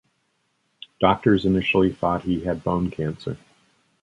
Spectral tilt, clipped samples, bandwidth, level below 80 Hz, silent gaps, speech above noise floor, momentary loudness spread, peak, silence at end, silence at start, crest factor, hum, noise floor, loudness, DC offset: -8 dB/octave; under 0.1%; 9.6 kHz; -46 dBFS; none; 49 dB; 11 LU; -2 dBFS; 0.65 s; 1 s; 22 dB; none; -70 dBFS; -22 LUFS; under 0.1%